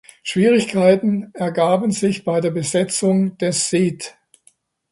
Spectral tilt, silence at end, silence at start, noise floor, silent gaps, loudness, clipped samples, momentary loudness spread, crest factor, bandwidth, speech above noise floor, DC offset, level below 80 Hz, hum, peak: -5 dB/octave; 0.8 s; 0.25 s; -58 dBFS; none; -18 LUFS; under 0.1%; 8 LU; 18 dB; 11.5 kHz; 40 dB; under 0.1%; -60 dBFS; none; -2 dBFS